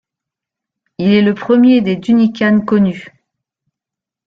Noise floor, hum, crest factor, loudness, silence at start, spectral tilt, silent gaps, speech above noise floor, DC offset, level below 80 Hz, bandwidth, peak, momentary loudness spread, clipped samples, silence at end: -85 dBFS; none; 12 dB; -12 LUFS; 1 s; -8 dB/octave; none; 74 dB; under 0.1%; -54 dBFS; 6.4 kHz; -2 dBFS; 7 LU; under 0.1%; 1.2 s